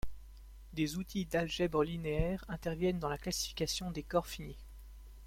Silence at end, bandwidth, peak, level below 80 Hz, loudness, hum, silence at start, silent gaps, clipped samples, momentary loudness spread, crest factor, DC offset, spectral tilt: 0 s; 16.5 kHz; -18 dBFS; -48 dBFS; -36 LUFS; none; 0.05 s; none; under 0.1%; 21 LU; 20 dB; under 0.1%; -5 dB/octave